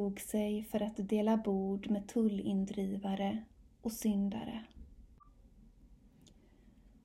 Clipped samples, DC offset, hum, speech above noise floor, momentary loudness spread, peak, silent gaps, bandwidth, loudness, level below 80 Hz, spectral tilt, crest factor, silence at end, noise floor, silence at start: under 0.1%; under 0.1%; none; 27 dB; 11 LU; -20 dBFS; none; 16 kHz; -36 LUFS; -62 dBFS; -6.5 dB/octave; 18 dB; 1.1 s; -62 dBFS; 0 s